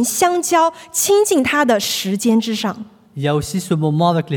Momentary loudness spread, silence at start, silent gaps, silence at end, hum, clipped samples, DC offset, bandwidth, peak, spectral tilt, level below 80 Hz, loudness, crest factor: 8 LU; 0 s; none; 0 s; none; under 0.1%; under 0.1%; 18 kHz; -2 dBFS; -4 dB/octave; -52 dBFS; -16 LUFS; 14 dB